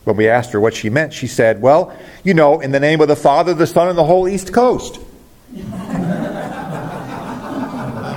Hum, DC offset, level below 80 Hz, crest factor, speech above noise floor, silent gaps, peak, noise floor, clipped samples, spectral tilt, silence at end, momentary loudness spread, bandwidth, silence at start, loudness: none; under 0.1%; -44 dBFS; 14 dB; 26 dB; none; 0 dBFS; -39 dBFS; under 0.1%; -6 dB/octave; 0 s; 14 LU; 17 kHz; 0.05 s; -15 LUFS